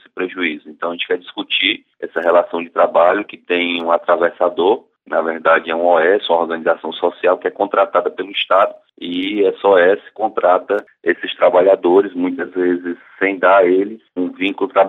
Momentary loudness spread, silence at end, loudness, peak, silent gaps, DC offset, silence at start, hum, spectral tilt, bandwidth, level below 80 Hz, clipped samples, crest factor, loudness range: 10 LU; 0 s; -16 LUFS; -2 dBFS; none; under 0.1%; 0.15 s; none; -6.5 dB/octave; 4.1 kHz; -70 dBFS; under 0.1%; 14 dB; 2 LU